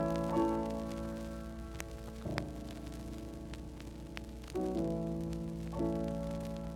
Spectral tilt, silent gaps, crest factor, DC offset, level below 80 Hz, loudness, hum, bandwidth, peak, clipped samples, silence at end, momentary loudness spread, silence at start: -7 dB/octave; none; 22 dB; under 0.1%; -48 dBFS; -39 LUFS; none; 17 kHz; -16 dBFS; under 0.1%; 0 s; 12 LU; 0 s